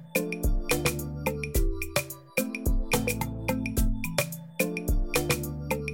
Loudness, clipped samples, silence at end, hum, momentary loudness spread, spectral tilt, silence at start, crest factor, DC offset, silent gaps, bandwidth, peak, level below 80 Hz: -29 LUFS; under 0.1%; 0 s; none; 5 LU; -4.5 dB/octave; 0 s; 20 dB; under 0.1%; none; 17 kHz; -8 dBFS; -32 dBFS